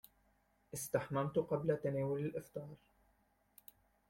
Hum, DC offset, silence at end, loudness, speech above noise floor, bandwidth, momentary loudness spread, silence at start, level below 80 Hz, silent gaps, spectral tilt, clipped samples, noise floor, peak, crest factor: none; under 0.1%; 1.35 s; -39 LUFS; 37 dB; 16.5 kHz; 21 LU; 0.75 s; -72 dBFS; none; -6.5 dB/octave; under 0.1%; -76 dBFS; -20 dBFS; 22 dB